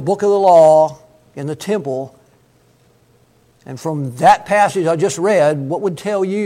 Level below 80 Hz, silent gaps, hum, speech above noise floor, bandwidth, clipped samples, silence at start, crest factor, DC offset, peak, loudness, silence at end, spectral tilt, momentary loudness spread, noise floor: -58 dBFS; none; none; 39 dB; 14.5 kHz; under 0.1%; 0 s; 16 dB; under 0.1%; 0 dBFS; -14 LUFS; 0 s; -5.5 dB/octave; 17 LU; -53 dBFS